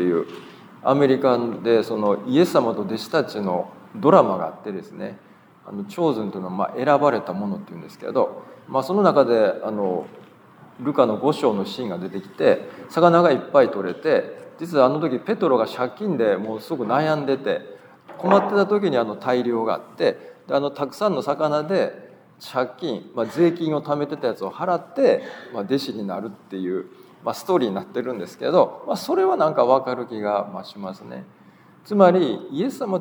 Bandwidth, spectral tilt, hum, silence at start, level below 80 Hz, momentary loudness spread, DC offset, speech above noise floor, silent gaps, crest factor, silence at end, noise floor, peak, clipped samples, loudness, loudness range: over 20 kHz; -7 dB/octave; none; 0 s; -78 dBFS; 15 LU; under 0.1%; 29 dB; none; 20 dB; 0 s; -50 dBFS; 0 dBFS; under 0.1%; -21 LUFS; 5 LU